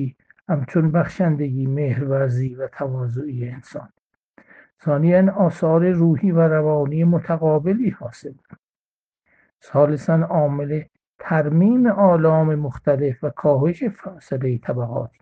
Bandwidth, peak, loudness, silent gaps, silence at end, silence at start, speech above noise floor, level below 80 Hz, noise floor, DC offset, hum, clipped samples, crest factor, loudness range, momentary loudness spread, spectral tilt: 7.4 kHz; -2 dBFS; -19 LUFS; 3.99-4.10 s, 4.23-4.34 s, 4.73-4.77 s, 8.59-9.11 s, 11.07-11.19 s; 0.15 s; 0 s; over 71 dB; -56 dBFS; under -90 dBFS; under 0.1%; none; under 0.1%; 18 dB; 5 LU; 13 LU; -10.5 dB/octave